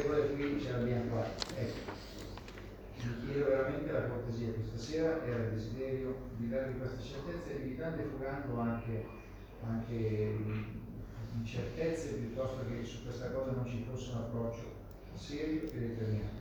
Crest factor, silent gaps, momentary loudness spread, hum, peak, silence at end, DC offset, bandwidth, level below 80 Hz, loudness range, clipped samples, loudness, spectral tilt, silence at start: 20 dB; none; 12 LU; none; -16 dBFS; 0 s; under 0.1%; over 20 kHz; -52 dBFS; 4 LU; under 0.1%; -38 LUFS; -7 dB/octave; 0 s